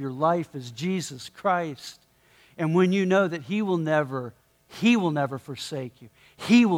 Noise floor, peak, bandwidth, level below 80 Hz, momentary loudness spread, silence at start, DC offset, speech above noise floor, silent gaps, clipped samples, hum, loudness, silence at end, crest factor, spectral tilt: -59 dBFS; -8 dBFS; 15 kHz; -70 dBFS; 15 LU; 0 s; under 0.1%; 34 dB; none; under 0.1%; none; -25 LUFS; 0 s; 18 dB; -6 dB/octave